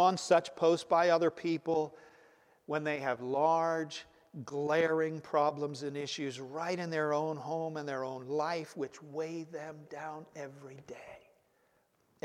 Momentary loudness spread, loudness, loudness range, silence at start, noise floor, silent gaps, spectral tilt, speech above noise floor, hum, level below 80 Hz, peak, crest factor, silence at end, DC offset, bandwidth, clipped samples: 18 LU; -33 LUFS; 9 LU; 0 s; -73 dBFS; none; -5 dB/octave; 39 dB; none; -82 dBFS; -14 dBFS; 20 dB; 1.05 s; under 0.1%; 12 kHz; under 0.1%